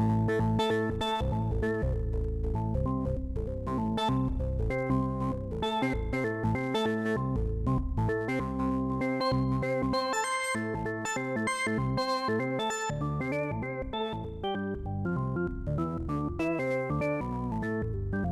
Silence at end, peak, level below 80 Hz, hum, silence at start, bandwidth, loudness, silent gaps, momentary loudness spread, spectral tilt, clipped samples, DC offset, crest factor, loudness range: 0 s; -16 dBFS; -40 dBFS; none; 0 s; 14 kHz; -31 LUFS; none; 5 LU; -6 dB/octave; under 0.1%; under 0.1%; 14 dB; 3 LU